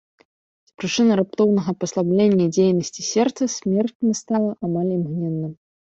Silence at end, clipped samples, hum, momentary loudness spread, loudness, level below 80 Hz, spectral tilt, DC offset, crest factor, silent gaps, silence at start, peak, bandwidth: 0.4 s; under 0.1%; none; 8 LU; -21 LUFS; -62 dBFS; -6 dB/octave; under 0.1%; 14 dB; 3.95-4.00 s; 0.8 s; -6 dBFS; 8 kHz